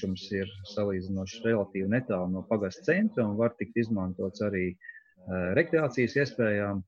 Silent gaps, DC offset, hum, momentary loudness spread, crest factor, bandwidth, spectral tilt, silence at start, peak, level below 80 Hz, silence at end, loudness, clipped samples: none; under 0.1%; none; 8 LU; 18 dB; 7.2 kHz; -7 dB/octave; 0 s; -10 dBFS; -64 dBFS; 0.05 s; -30 LUFS; under 0.1%